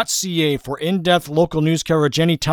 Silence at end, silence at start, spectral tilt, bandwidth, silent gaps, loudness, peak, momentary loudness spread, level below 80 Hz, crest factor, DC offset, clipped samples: 0 s; 0 s; -4.5 dB/octave; 19 kHz; none; -18 LUFS; -4 dBFS; 4 LU; -46 dBFS; 14 dB; under 0.1%; under 0.1%